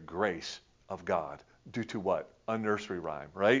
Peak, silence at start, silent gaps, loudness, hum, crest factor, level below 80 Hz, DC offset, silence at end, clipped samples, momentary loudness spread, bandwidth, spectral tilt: -12 dBFS; 0 s; none; -35 LUFS; none; 22 dB; -64 dBFS; under 0.1%; 0 s; under 0.1%; 12 LU; 7.6 kHz; -5.5 dB/octave